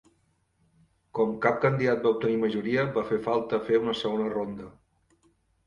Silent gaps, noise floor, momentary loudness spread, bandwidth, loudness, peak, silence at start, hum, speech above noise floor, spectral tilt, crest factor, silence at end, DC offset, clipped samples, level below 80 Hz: none; -70 dBFS; 9 LU; 7.4 kHz; -27 LUFS; -8 dBFS; 1.15 s; none; 44 dB; -7.5 dB/octave; 22 dB; 0.95 s; under 0.1%; under 0.1%; -64 dBFS